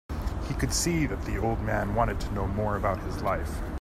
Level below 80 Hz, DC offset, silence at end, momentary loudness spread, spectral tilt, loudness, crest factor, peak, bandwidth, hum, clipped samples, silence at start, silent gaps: -34 dBFS; under 0.1%; 0 s; 6 LU; -5 dB/octave; -29 LUFS; 18 dB; -10 dBFS; 15 kHz; none; under 0.1%; 0.1 s; none